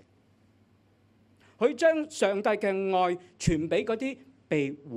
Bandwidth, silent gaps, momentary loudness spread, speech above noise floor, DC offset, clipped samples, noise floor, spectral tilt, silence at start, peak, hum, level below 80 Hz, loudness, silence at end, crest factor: 13 kHz; none; 7 LU; 37 dB; under 0.1%; under 0.1%; -64 dBFS; -5.5 dB/octave; 1.6 s; -10 dBFS; none; -50 dBFS; -28 LUFS; 0 s; 18 dB